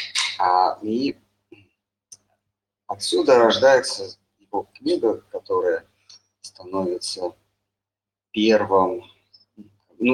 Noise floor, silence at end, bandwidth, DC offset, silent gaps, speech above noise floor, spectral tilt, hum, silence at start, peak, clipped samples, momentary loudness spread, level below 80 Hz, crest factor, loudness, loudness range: -89 dBFS; 0 s; 12 kHz; under 0.1%; none; 69 dB; -3.5 dB/octave; none; 0 s; -2 dBFS; under 0.1%; 16 LU; -66 dBFS; 20 dB; -21 LUFS; 6 LU